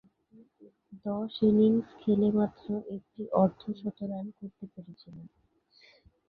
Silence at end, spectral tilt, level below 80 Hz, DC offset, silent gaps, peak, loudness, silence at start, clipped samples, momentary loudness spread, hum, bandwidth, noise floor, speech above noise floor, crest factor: 1 s; -10.5 dB/octave; -66 dBFS; under 0.1%; none; -12 dBFS; -29 LUFS; 0.9 s; under 0.1%; 24 LU; none; 4.8 kHz; -63 dBFS; 34 dB; 20 dB